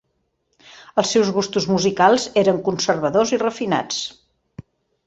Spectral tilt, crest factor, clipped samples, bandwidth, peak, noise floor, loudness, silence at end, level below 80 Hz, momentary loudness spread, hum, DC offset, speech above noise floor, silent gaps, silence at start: -4 dB/octave; 18 dB; under 0.1%; 8.2 kHz; -2 dBFS; -70 dBFS; -19 LUFS; 0.45 s; -58 dBFS; 8 LU; none; under 0.1%; 52 dB; none; 0.95 s